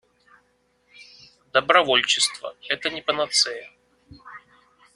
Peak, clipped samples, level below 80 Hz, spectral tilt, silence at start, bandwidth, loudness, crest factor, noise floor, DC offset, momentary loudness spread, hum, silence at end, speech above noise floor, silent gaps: -2 dBFS; under 0.1%; -66 dBFS; -0.5 dB/octave; 1 s; 12 kHz; -21 LUFS; 24 dB; -66 dBFS; under 0.1%; 19 LU; none; 0.55 s; 44 dB; none